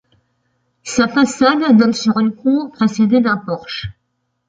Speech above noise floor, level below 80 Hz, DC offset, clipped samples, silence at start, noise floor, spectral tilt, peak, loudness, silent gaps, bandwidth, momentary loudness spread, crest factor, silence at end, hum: 55 dB; -50 dBFS; under 0.1%; under 0.1%; 0.85 s; -70 dBFS; -5 dB/octave; 0 dBFS; -15 LUFS; none; 9.2 kHz; 14 LU; 16 dB; 0.6 s; none